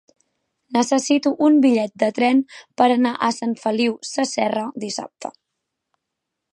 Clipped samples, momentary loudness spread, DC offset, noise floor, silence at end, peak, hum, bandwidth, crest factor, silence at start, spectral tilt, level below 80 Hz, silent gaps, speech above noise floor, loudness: under 0.1%; 13 LU; under 0.1%; -81 dBFS; 1.25 s; -2 dBFS; none; 11 kHz; 18 dB; 0.7 s; -4 dB/octave; -74 dBFS; none; 61 dB; -20 LUFS